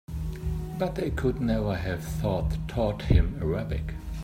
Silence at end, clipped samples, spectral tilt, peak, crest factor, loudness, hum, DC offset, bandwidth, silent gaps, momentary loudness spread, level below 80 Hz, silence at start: 0 s; under 0.1%; -7.5 dB/octave; -8 dBFS; 20 dB; -29 LUFS; none; under 0.1%; 16 kHz; none; 9 LU; -32 dBFS; 0.1 s